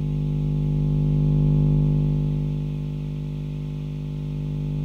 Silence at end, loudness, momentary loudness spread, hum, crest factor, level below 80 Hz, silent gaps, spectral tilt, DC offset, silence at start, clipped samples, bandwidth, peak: 0 s; -24 LUFS; 10 LU; 50 Hz at -25 dBFS; 12 dB; -32 dBFS; none; -10.5 dB/octave; under 0.1%; 0 s; under 0.1%; 4.1 kHz; -12 dBFS